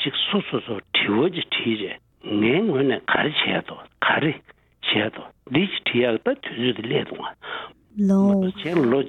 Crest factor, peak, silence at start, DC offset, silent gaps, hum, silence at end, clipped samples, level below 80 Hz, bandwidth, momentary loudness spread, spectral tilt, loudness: 20 dB; -4 dBFS; 0 s; under 0.1%; none; none; 0 s; under 0.1%; -62 dBFS; 6.6 kHz; 13 LU; -7 dB/octave; -22 LUFS